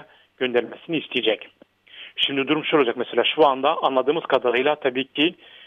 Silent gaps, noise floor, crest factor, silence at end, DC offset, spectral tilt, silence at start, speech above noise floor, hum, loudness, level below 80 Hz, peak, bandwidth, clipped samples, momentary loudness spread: none; -45 dBFS; 18 dB; 0.35 s; under 0.1%; -6 dB/octave; 0.4 s; 23 dB; none; -22 LUFS; -70 dBFS; -4 dBFS; 6.4 kHz; under 0.1%; 10 LU